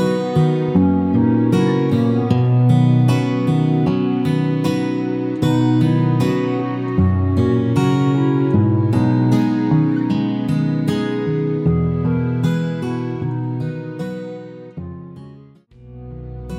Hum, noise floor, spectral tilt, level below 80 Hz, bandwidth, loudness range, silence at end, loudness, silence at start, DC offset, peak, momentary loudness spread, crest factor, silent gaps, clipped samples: none; -44 dBFS; -8.5 dB/octave; -44 dBFS; 12 kHz; 8 LU; 0 s; -17 LUFS; 0 s; under 0.1%; -2 dBFS; 12 LU; 14 dB; none; under 0.1%